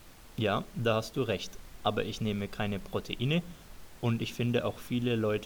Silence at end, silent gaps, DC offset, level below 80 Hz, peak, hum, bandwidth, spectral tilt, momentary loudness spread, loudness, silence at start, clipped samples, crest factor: 0 s; none; under 0.1%; -52 dBFS; -12 dBFS; none; over 20 kHz; -6 dB/octave; 6 LU; -32 LUFS; 0 s; under 0.1%; 20 dB